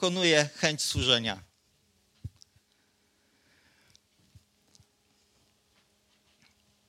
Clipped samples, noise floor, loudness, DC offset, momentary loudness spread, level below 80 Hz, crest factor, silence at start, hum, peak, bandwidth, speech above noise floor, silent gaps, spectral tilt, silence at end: under 0.1%; -70 dBFS; -26 LUFS; under 0.1%; 24 LU; -56 dBFS; 28 dB; 0 s; none; -6 dBFS; 16.5 kHz; 43 dB; none; -3 dB/octave; 4.6 s